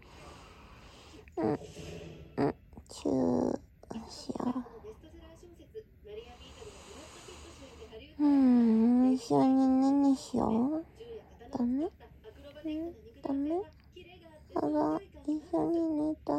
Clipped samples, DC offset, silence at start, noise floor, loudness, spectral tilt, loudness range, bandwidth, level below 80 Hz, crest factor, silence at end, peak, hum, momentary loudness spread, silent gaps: under 0.1%; under 0.1%; 0.15 s; -54 dBFS; -30 LUFS; -7 dB/octave; 16 LU; 9.4 kHz; -58 dBFS; 16 dB; 0 s; -16 dBFS; none; 24 LU; none